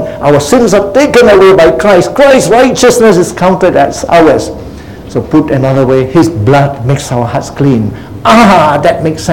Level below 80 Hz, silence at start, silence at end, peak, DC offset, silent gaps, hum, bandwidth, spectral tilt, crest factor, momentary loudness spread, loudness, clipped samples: -32 dBFS; 0 s; 0 s; 0 dBFS; 0.9%; none; none; 18 kHz; -5.5 dB/octave; 6 dB; 9 LU; -6 LUFS; 5%